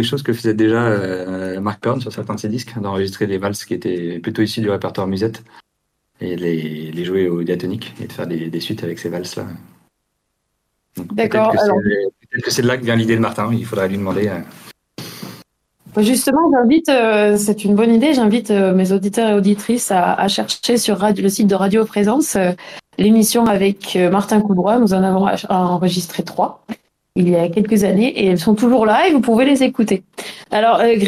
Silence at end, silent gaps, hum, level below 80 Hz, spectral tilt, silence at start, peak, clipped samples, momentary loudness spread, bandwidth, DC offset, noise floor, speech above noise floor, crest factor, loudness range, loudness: 0 s; none; none; -54 dBFS; -5.5 dB/octave; 0 s; -2 dBFS; under 0.1%; 13 LU; 15.5 kHz; under 0.1%; -71 dBFS; 56 dB; 14 dB; 8 LU; -16 LUFS